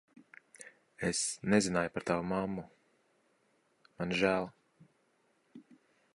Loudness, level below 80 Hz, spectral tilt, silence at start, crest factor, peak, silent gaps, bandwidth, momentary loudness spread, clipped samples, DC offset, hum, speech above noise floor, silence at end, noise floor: -33 LUFS; -64 dBFS; -4 dB/octave; 0.6 s; 24 dB; -14 dBFS; none; 11.5 kHz; 23 LU; under 0.1%; under 0.1%; none; 41 dB; 0.55 s; -74 dBFS